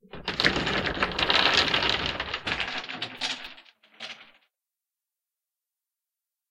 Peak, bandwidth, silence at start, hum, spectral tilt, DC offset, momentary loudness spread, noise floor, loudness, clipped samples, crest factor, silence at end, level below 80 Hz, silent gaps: -4 dBFS; 16.5 kHz; 0.15 s; none; -3 dB/octave; under 0.1%; 20 LU; -89 dBFS; -25 LUFS; under 0.1%; 26 dB; 2.25 s; -50 dBFS; none